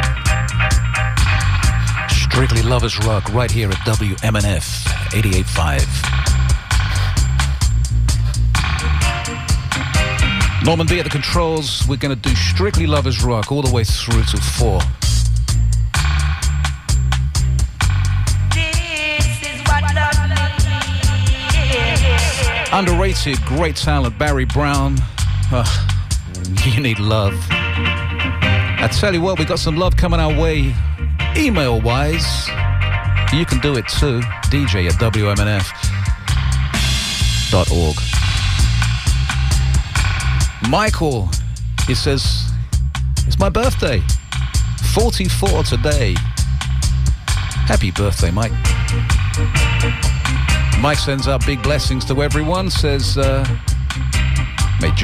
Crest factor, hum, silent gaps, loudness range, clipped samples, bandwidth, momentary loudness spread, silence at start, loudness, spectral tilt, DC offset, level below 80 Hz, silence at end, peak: 12 dB; none; none; 2 LU; under 0.1%; 15 kHz; 4 LU; 0 s; -17 LUFS; -4.5 dB/octave; under 0.1%; -20 dBFS; 0 s; -4 dBFS